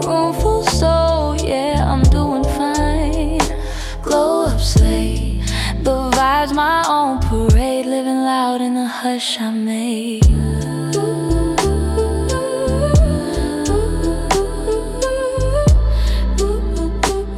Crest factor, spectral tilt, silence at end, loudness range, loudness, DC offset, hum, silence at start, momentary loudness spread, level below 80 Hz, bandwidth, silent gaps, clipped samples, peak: 14 dB; -5.5 dB/octave; 0 s; 2 LU; -17 LUFS; under 0.1%; none; 0 s; 6 LU; -20 dBFS; 15 kHz; none; under 0.1%; -2 dBFS